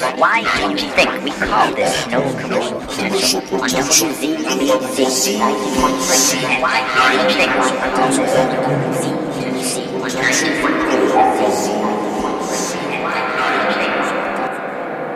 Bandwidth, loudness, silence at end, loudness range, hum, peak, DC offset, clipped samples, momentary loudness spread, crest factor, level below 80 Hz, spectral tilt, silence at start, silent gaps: 14 kHz; -16 LUFS; 0 s; 3 LU; none; -2 dBFS; under 0.1%; under 0.1%; 7 LU; 16 dB; -46 dBFS; -2.5 dB/octave; 0 s; none